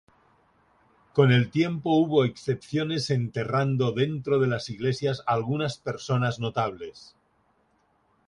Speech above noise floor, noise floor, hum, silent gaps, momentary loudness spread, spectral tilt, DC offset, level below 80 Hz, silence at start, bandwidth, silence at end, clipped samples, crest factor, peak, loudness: 42 dB; -67 dBFS; none; none; 8 LU; -7 dB/octave; under 0.1%; -62 dBFS; 1.15 s; 10.5 kHz; 1.3 s; under 0.1%; 20 dB; -8 dBFS; -26 LUFS